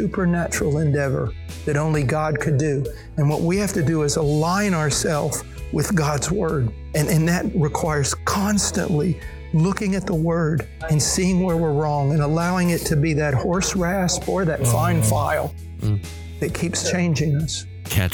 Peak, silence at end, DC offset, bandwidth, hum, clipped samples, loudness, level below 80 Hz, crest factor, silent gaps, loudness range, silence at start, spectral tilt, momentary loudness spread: -4 dBFS; 0 s; under 0.1%; 19 kHz; none; under 0.1%; -21 LUFS; -36 dBFS; 16 dB; none; 2 LU; 0 s; -5.5 dB/octave; 6 LU